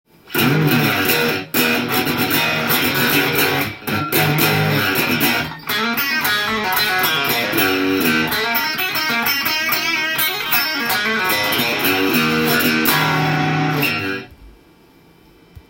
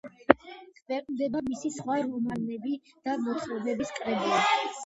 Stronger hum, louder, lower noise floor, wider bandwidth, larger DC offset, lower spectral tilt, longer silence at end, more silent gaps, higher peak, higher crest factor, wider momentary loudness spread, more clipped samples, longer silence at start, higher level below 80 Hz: neither; first, -16 LUFS vs -29 LUFS; about the same, -49 dBFS vs -49 dBFS; first, 17 kHz vs 8 kHz; neither; about the same, -3.5 dB/octave vs -4.5 dB/octave; about the same, 0.1 s vs 0 s; second, none vs 0.82-0.86 s; about the same, -2 dBFS vs 0 dBFS; second, 16 dB vs 30 dB; second, 3 LU vs 10 LU; neither; first, 0.25 s vs 0.05 s; first, -52 dBFS vs -64 dBFS